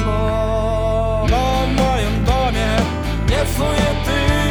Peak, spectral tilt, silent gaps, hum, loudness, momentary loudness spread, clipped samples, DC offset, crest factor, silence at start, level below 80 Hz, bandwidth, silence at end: -2 dBFS; -5.5 dB/octave; none; none; -18 LUFS; 2 LU; under 0.1%; under 0.1%; 16 dB; 0 s; -22 dBFS; over 20 kHz; 0 s